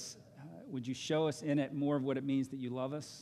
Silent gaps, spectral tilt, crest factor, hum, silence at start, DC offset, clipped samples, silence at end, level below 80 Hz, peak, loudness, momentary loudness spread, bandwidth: none; -6 dB/octave; 16 dB; none; 0 s; under 0.1%; under 0.1%; 0 s; -78 dBFS; -22 dBFS; -36 LUFS; 14 LU; 13 kHz